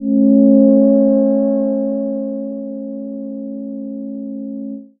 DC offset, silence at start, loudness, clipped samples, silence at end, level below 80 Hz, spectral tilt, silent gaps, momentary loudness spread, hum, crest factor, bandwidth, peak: under 0.1%; 0 s; -14 LUFS; under 0.1%; 0.15 s; -62 dBFS; -17 dB/octave; none; 16 LU; none; 14 dB; 1.7 kHz; 0 dBFS